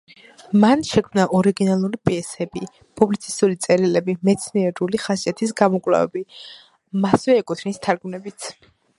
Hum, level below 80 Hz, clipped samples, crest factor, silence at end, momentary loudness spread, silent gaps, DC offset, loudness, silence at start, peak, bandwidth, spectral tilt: none; -56 dBFS; under 0.1%; 20 dB; 0.45 s; 15 LU; none; under 0.1%; -20 LUFS; 0.5 s; 0 dBFS; 11.5 kHz; -6 dB/octave